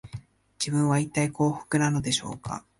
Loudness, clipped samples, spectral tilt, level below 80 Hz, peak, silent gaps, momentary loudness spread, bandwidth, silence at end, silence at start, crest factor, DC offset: -26 LUFS; under 0.1%; -5 dB/octave; -56 dBFS; -10 dBFS; none; 12 LU; 11.5 kHz; 0.2 s; 0.05 s; 16 dB; under 0.1%